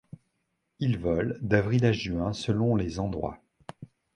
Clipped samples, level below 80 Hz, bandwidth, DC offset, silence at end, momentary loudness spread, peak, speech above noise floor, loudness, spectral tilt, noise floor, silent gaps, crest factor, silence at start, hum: under 0.1%; -48 dBFS; 10 kHz; under 0.1%; 0.3 s; 21 LU; -8 dBFS; 51 dB; -28 LUFS; -7 dB/octave; -78 dBFS; none; 22 dB; 0.8 s; none